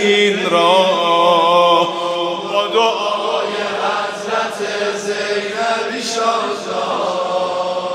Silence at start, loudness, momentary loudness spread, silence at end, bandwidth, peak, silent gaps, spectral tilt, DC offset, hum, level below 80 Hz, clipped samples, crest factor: 0 s; -16 LUFS; 8 LU; 0 s; 13.5 kHz; 0 dBFS; none; -3 dB/octave; under 0.1%; none; -66 dBFS; under 0.1%; 16 dB